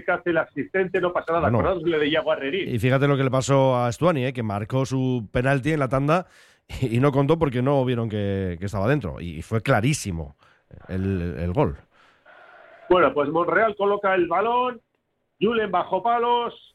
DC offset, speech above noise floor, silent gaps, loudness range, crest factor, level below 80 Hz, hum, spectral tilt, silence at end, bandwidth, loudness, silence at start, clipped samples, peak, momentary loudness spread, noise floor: under 0.1%; 51 dB; none; 4 LU; 16 dB; -46 dBFS; none; -6.5 dB/octave; 0.2 s; 13 kHz; -23 LUFS; 0.05 s; under 0.1%; -6 dBFS; 7 LU; -73 dBFS